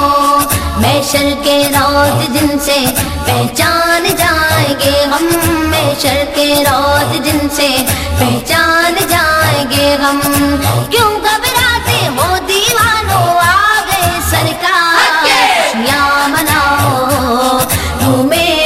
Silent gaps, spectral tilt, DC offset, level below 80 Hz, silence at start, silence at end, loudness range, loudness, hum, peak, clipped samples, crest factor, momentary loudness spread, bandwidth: none; -3.5 dB/octave; 0.2%; -28 dBFS; 0 s; 0 s; 1 LU; -10 LUFS; none; 0 dBFS; under 0.1%; 10 dB; 4 LU; 16.5 kHz